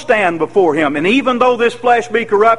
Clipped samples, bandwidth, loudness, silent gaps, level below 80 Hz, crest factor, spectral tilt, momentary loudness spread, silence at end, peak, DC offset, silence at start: under 0.1%; 11.5 kHz; -13 LUFS; none; -54 dBFS; 12 dB; -5 dB/octave; 2 LU; 0 s; 0 dBFS; 1%; 0 s